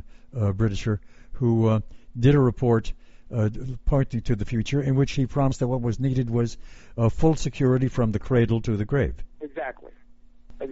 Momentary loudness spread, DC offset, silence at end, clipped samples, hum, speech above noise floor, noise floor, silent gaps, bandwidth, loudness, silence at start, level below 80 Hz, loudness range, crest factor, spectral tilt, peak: 12 LU; 0.3%; 0 s; under 0.1%; none; 26 dB; -49 dBFS; none; 8 kHz; -24 LUFS; 0 s; -36 dBFS; 2 LU; 18 dB; -8 dB/octave; -6 dBFS